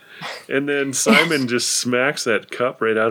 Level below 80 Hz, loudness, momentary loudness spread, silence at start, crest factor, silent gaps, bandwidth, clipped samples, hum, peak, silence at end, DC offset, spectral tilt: -76 dBFS; -18 LUFS; 9 LU; 0.1 s; 20 dB; none; 17 kHz; under 0.1%; none; 0 dBFS; 0 s; under 0.1%; -3 dB/octave